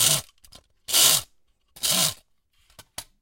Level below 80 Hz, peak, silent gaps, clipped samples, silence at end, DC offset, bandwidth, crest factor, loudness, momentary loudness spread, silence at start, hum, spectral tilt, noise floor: -60 dBFS; -4 dBFS; none; under 0.1%; 0.2 s; under 0.1%; 17 kHz; 22 dB; -20 LUFS; 24 LU; 0 s; none; 0 dB/octave; -64 dBFS